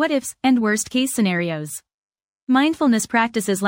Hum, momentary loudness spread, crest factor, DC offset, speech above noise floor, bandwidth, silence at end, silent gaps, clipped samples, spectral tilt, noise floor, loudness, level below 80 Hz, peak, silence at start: none; 11 LU; 16 dB; under 0.1%; over 71 dB; 16.5 kHz; 0 s; 1.94-2.10 s, 2.24-2.47 s; under 0.1%; -4 dB/octave; under -90 dBFS; -20 LUFS; -62 dBFS; -4 dBFS; 0 s